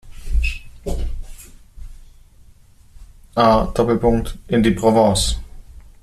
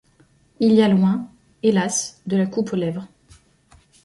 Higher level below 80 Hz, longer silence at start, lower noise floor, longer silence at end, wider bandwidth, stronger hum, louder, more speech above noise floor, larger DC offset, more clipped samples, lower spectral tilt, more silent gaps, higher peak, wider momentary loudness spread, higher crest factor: first, -28 dBFS vs -60 dBFS; second, 0.05 s vs 0.6 s; second, -47 dBFS vs -57 dBFS; second, 0.25 s vs 1 s; first, 14 kHz vs 11.5 kHz; neither; about the same, -18 LUFS vs -20 LUFS; second, 31 dB vs 38 dB; neither; neither; about the same, -5.5 dB/octave vs -5.5 dB/octave; neither; about the same, -2 dBFS vs -4 dBFS; first, 16 LU vs 12 LU; about the same, 16 dB vs 16 dB